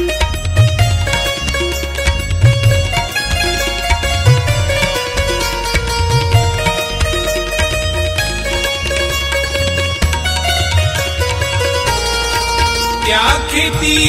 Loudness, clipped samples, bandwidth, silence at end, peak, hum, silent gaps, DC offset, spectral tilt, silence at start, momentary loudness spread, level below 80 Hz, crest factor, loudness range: -14 LUFS; under 0.1%; 16 kHz; 0 s; 0 dBFS; none; none; under 0.1%; -3.5 dB/octave; 0 s; 4 LU; -22 dBFS; 14 dB; 2 LU